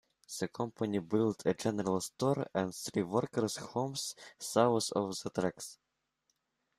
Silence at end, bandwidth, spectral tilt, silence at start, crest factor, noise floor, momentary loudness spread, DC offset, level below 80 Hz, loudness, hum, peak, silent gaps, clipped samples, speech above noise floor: 1.05 s; 14.5 kHz; -5 dB/octave; 0.3 s; 22 dB; -82 dBFS; 10 LU; under 0.1%; -72 dBFS; -34 LUFS; none; -14 dBFS; none; under 0.1%; 48 dB